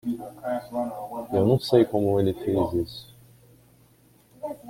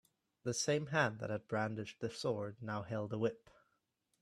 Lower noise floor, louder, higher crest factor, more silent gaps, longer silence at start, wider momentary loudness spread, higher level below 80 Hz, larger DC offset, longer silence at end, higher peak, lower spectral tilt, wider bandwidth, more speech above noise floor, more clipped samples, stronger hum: second, -58 dBFS vs -82 dBFS; first, -25 LUFS vs -39 LUFS; about the same, 20 dB vs 22 dB; neither; second, 0.05 s vs 0.45 s; first, 15 LU vs 9 LU; first, -54 dBFS vs -76 dBFS; neither; second, 0 s vs 0.85 s; first, -6 dBFS vs -18 dBFS; first, -8 dB/octave vs -4.5 dB/octave; first, 16.5 kHz vs 13.5 kHz; second, 35 dB vs 44 dB; neither; neither